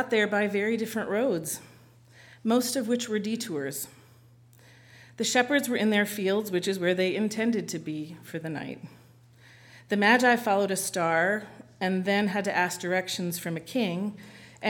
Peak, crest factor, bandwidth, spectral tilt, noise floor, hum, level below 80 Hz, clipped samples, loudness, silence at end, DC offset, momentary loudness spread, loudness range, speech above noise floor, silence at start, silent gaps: -6 dBFS; 22 dB; 19 kHz; -4 dB/octave; -56 dBFS; none; -72 dBFS; under 0.1%; -27 LUFS; 0 s; under 0.1%; 13 LU; 6 LU; 29 dB; 0 s; none